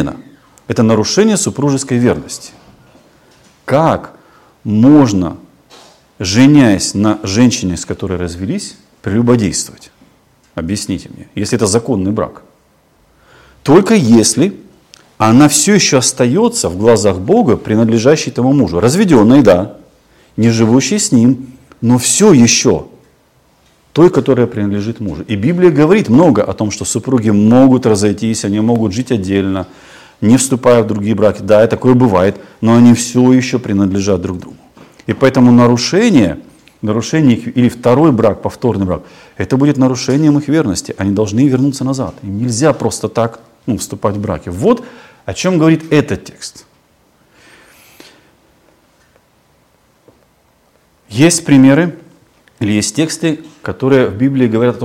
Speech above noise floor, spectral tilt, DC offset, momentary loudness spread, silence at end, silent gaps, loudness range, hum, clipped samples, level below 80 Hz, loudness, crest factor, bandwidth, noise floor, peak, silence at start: 42 dB; -5.5 dB/octave; under 0.1%; 13 LU; 0 s; none; 6 LU; none; 1%; -46 dBFS; -11 LUFS; 12 dB; 15.5 kHz; -53 dBFS; 0 dBFS; 0 s